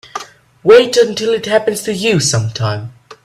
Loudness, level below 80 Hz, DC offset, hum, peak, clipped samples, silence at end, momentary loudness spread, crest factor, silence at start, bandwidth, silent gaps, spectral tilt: -13 LUFS; -50 dBFS; under 0.1%; none; 0 dBFS; under 0.1%; 0.1 s; 18 LU; 14 dB; 0.15 s; 14.5 kHz; none; -4 dB/octave